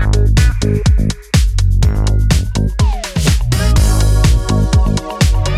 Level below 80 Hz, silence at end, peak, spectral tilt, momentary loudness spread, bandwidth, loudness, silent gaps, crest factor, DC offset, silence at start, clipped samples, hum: -14 dBFS; 0 s; 0 dBFS; -5.5 dB/octave; 4 LU; 14.5 kHz; -14 LUFS; none; 10 dB; under 0.1%; 0 s; under 0.1%; none